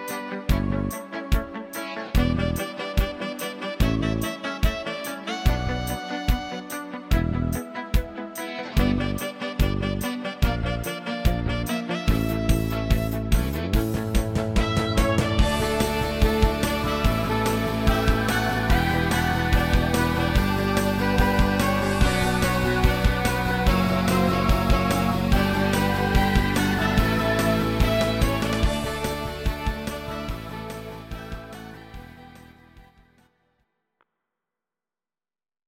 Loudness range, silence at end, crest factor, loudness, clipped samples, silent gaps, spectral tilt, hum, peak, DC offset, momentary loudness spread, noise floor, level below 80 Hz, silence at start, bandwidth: 6 LU; 2.85 s; 18 dB; -24 LUFS; under 0.1%; none; -5.5 dB/octave; none; -4 dBFS; under 0.1%; 10 LU; under -90 dBFS; -28 dBFS; 0 s; 17 kHz